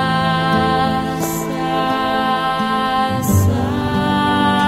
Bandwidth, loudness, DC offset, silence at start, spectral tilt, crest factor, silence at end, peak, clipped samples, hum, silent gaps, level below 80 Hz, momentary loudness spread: 16 kHz; -17 LUFS; under 0.1%; 0 s; -5.5 dB/octave; 14 dB; 0 s; -2 dBFS; under 0.1%; none; none; -40 dBFS; 4 LU